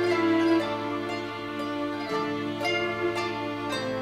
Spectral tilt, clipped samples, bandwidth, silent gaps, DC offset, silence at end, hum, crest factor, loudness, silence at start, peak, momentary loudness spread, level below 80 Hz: -5 dB/octave; under 0.1%; 13.5 kHz; none; under 0.1%; 0 s; none; 16 dB; -28 LUFS; 0 s; -12 dBFS; 9 LU; -62 dBFS